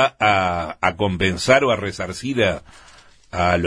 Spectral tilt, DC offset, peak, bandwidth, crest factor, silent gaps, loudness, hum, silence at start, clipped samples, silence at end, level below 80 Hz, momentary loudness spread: -5 dB/octave; under 0.1%; 0 dBFS; 11 kHz; 20 dB; none; -19 LUFS; none; 0 s; under 0.1%; 0 s; -44 dBFS; 11 LU